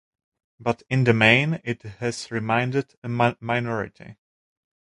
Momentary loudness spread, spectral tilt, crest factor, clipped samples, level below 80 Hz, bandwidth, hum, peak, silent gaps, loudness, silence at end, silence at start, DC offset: 14 LU; -6 dB/octave; 24 dB; under 0.1%; -58 dBFS; 11.5 kHz; none; 0 dBFS; 2.97-3.02 s; -23 LUFS; 0.8 s; 0.6 s; under 0.1%